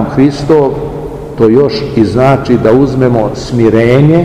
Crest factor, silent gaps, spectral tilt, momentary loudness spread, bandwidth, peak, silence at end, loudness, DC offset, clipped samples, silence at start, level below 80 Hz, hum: 8 dB; none; -8 dB/octave; 8 LU; 11 kHz; 0 dBFS; 0 s; -9 LUFS; 0.7%; 4%; 0 s; -30 dBFS; none